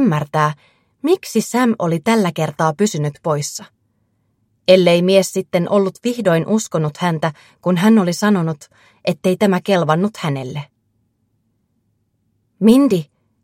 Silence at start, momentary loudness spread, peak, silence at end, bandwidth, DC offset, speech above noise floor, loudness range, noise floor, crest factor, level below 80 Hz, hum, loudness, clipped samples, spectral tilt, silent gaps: 0 s; 12 LU; 0 dBFS; 0.4 s; 16 kHz; under 0.1%; 50 dB; 4 LU; -66 dBFS; 18 dB; -62 dBFS; none; -17 LUFS; under 0.1%; -6 dB/octave; none